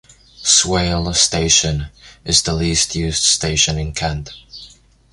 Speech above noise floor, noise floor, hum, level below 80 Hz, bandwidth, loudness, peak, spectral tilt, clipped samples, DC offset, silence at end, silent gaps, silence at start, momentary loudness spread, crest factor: 27 dB; -45 dBFS; none; -32 dBFS; 11.5 kHz; -15 LUFS; 0 dBFS; -2.5 dB/octave; under 0.1%; under 0.1%; 0.45 s; none; 0.4 s; 21 LU; 18 dB